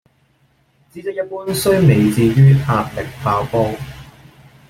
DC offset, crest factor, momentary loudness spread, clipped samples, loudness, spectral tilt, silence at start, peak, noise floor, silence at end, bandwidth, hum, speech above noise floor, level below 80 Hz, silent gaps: under 0.1%; 14 dB; 15 LU; under 0.1%; -16 LUFS; -7 dB/octave; 0.95 s; -2 dBFS; -58 dBFS; 0.65 s; 15.5 kHz; none; 44 dB; -44 dBFS; none